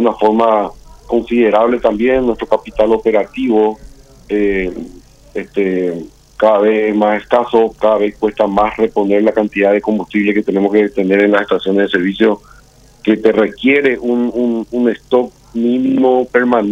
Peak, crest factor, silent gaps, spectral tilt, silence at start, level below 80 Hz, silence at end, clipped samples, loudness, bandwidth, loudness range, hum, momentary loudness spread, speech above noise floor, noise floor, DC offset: 0 dBFS; 14 dB; none; -7 dB/octave; 0 s; -42 dBFS; 0 s; under 0.1%; -14 LUFS; 8.4 kHz; 3 LU; none; 7 LU; 31 dB; -44 dBFS; under 0.1%